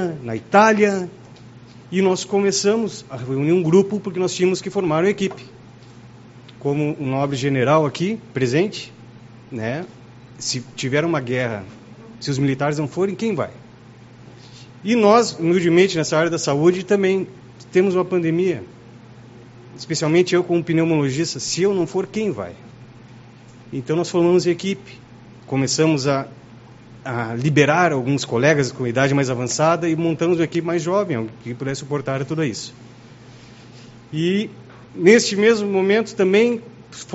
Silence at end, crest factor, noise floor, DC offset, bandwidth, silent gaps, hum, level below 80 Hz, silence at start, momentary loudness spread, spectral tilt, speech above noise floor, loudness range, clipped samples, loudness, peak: 0 s; 20 dB; -43 dBFS; under 0.1%; 8 kHz; none; none; -58 dBFS; 0 s; 14 LU; -5 dB/octave; 25 dB; 6 LU; under 0.1%; -19 LUFS; 0 dBFS